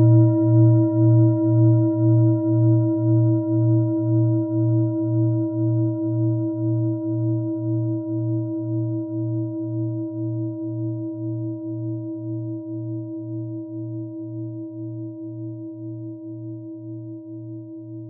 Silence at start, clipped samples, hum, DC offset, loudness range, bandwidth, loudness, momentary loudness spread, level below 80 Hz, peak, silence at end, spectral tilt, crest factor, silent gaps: 0 s; under 0.1%; none; under 0.1%; 14 LU; 1.5 kHz; -22 LUFS; 17 LU; -70 dBFS; -6 dBFS; 0 s; -17.5 dB/octave; 16 dB; none